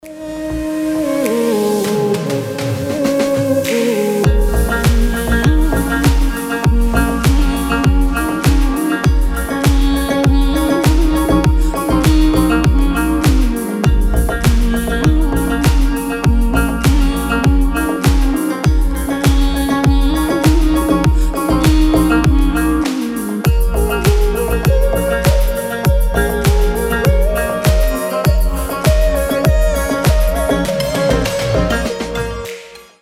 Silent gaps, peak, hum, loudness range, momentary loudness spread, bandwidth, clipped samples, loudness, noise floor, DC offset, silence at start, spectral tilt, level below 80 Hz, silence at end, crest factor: none; 0 dBFS; none; 2 LU; 4 LU; 16 kHz; under 0.1%; -15 LUFS; -33 dBFS; under 0.1%; 0.05 s; -6 dB/octave; -16 dBFS; 0.2 s; 12 dB